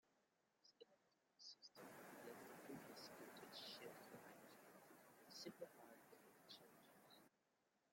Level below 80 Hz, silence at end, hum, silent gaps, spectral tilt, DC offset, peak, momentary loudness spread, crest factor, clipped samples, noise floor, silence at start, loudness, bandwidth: under -90 dBFS; 0.05 s; none; none; -3 dB/octave; under 0.1%; -42 dBFS; 11 LU; 20 dB; under 0.1%; -87 dBFS; 0.05 s; -61 LUFS; 16.5 kHz